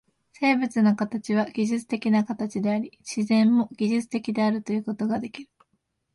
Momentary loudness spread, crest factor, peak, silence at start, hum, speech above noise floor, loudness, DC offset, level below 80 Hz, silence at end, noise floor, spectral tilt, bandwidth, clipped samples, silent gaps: 8 LU; 16 dB; -10 dBFS; 0.4 s; none; 50 dB; -25 LUFS; under 0.1%; -68 dBFS; 0.7 s; -74 dBFS; -6 dB/octave; 11.5 kHz; under 0.1%; none